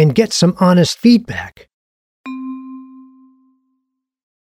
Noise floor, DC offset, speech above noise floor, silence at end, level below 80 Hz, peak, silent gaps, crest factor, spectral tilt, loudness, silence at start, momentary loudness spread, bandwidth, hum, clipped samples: -72 dBFS; under 0.1%; 59 dB; 1.65 s; -52 dBFS; 0 dBFS; 1.73-2.24 s; 16 dB; -6 dB/octave; -13 LUFS; 0 s; 23 LU; 14.5 kHz; none; under 0.1%